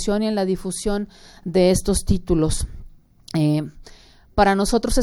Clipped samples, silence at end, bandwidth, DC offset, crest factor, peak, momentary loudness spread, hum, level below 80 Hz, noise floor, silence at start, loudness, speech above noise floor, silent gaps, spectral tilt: under 0.1%; 0 s; 17 kHz; under 0.1%; 16 dB; -4 dBFS; 10 LU; none; -30 dBFS; -43 dBFS; 0 s; -21 LUFS; 23 dB; none; -5.5 dB/octave